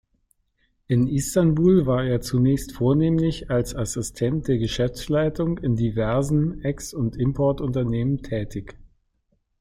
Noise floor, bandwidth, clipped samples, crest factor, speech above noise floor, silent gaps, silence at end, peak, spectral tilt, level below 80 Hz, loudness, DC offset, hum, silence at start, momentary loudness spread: -70 dBFS; 15.5 kHz; under 0.1%; 16 dB; 48 dB; none; 0.75 s; -8 dBFS; -7 dB/octave; -40 dBFS; -23 LUFS; under 0.1%; none; 0.9 s; 8 LU